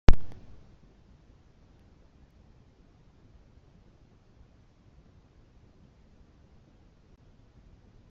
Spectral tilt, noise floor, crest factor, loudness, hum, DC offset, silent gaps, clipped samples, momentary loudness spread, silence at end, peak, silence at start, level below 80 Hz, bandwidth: -7 dB/octave; -59 dBFS; 26 dB; -34 LUFS; none; under 0.1%; none; under 0.1%; 5 LU; 7.8 s; -2 dBFS; 0.1 s; -34 dBFS; 6.8 kHz